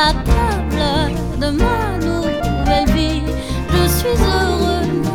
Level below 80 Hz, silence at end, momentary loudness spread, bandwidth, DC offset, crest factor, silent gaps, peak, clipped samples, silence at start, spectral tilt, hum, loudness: -22 dBFS; 0 s; 5 LU; 19 kHz; under 0.1%; 14 dB; none; -2 dBFS; under 0.1%; 0 s; -5.5 dB/octave; none; -17 LUFS